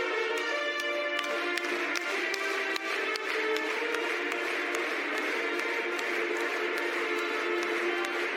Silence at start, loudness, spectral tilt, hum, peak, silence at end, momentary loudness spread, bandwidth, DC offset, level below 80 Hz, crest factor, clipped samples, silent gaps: 0 s; -30 LUFS; -0.5 dB/octave; none; -10 dBFS; 0 s; 1 LU; 16 kHz; under 0.1%; -88 dBFS; 20 dB; under 0.1%; none